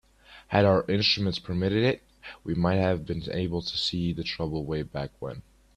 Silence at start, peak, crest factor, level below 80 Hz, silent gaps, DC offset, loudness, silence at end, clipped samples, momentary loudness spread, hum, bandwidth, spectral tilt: 0.3 s; -6 dBFS; 22 dB; -50 dBFS; none; under 0.1%; -27 LUFS; 0.35 s; under 0.1%; 13 LU; none; 10.5 kHz; -6.5 dB/octave